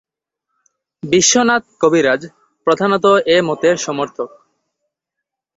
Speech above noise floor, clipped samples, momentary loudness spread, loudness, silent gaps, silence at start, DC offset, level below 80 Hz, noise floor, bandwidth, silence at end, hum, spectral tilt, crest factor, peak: 66 dB; under 0.1%; 12 LU; -14 LUFS; none; 1.05 s; under 0.1%; -56 dBFS; -81 dBFS; 8 kHz; 1.3 s; none; -3 dB/octave; 16 dB; 0 dBFS